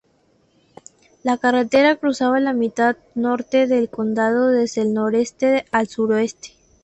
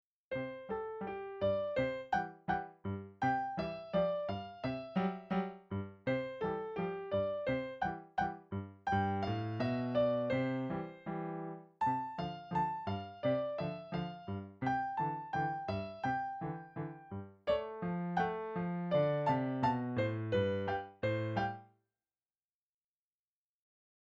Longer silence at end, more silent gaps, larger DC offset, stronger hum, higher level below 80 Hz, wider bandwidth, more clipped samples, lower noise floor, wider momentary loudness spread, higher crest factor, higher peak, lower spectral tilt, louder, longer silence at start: second, 0.35 s vs 2.4 s; neither; neither; neither; about the same, -60 dBFS vs -64 dBFS; about the same, 8.4 kHz vs 7.8 kHz; neither; second, -60 dBFS vs under -90 dBFS; second, 6 LU vs 9 LU; about the same, 16 dB vs 18 dB; first, -4 dBFS vs -20 dBFS; second, -5 dB/octave vs -8 dB/octave; first, -19 LUFS vs -37 LUFS; first, 1.25 s vs 0.3 s